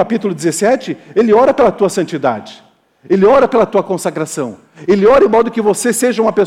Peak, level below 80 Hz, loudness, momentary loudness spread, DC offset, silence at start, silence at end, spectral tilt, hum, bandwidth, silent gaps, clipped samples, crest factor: -2 dBFS; -46 dBFS; -13 LUFS; 10 LU; under 0.1%; 0 s; 0 s; -5 dB/octave; none; 15.5 kHz; none; under 0.1%; 10 dB